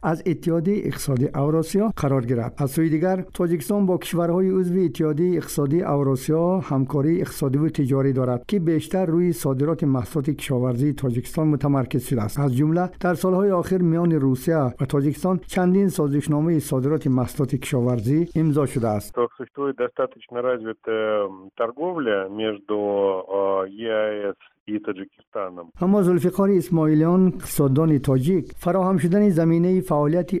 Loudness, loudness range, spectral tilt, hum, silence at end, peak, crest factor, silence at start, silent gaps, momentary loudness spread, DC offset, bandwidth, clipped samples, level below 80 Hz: -22 LUFS; 5 LU; -7.5 dB/octave; none; 0 s; -8 dBFS; 14 dB; 0 s; 24.60-24.66 s, 25.27-25.32 s; 7 LU; under 0.1%; 16 kHz; under 0.1%; -50 dBFS